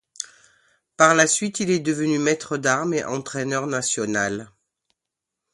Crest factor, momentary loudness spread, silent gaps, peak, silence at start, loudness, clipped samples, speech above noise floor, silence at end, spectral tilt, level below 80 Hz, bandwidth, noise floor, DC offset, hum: 24 dB; 12 LU; none; 0 dBFS; 0.2 s; -21 LUFS; under 0.1%; 63 dB; 1.1 s; -3.5 dB/octave; -64 dBFS; 11.5 kHz; -85 dBFS; under 0.1%; none